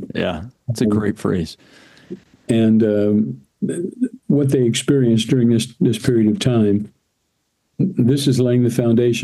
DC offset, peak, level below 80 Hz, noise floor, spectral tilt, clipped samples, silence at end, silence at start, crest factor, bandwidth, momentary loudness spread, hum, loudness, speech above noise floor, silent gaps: under 0.1%; -2 dBFS; -50 dBFS; -70 dBFS; -6.5 dB/octave; under 0.1%; 0 s; 0 s; 16 dB; 12.5 kHz; 11 LU; none; -18 LUFS; 53 dB; none